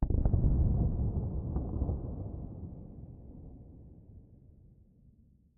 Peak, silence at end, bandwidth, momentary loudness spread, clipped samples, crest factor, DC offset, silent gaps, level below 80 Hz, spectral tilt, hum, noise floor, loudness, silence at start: -14 dBFS; 1.2 s; 1.7 kHz; 24 LU; under 0.1%; 20 dB; under 0.1%; none; -36 dBFS; -15 dB/octave; none; -62 dBFS; -34 LUFS; 0 s